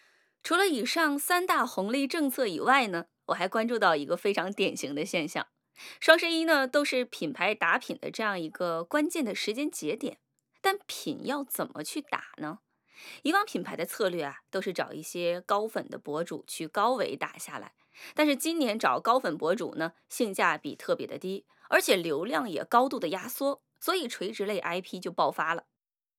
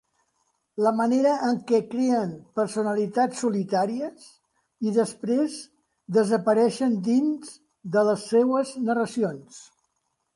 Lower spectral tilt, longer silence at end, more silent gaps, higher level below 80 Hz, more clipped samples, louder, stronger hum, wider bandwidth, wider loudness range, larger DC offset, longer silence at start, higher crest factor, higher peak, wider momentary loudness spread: second, -3 dB/octave vs -6 dB/octave; second, 0.6 s vs 0.75 s; neither; second, under -90 dBFS vs -74 dBFS; neither; second, -29 LUFS vs -24 LUFS; neither; first, 19 kHz vs 11.5 kHz; first, 6 LU vs 3 LU; neither; second, 0.45 s vs 0.75 s; first, 26 dB vs 16 dB; first, -4 dBFS vs -8 dBFS; about the same, 11 LU vs 9 LU